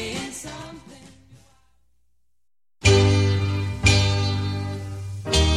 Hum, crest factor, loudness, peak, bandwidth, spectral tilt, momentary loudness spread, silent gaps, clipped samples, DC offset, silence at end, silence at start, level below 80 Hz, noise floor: none; 20 dB; -21 LUFS; -2 dBFS; 12 kHz; -4.5 dB/octave; 17 LU; none; under 0.1%; 0.1%; 0 s; 0 s; -34 dBFS; -84 dBFS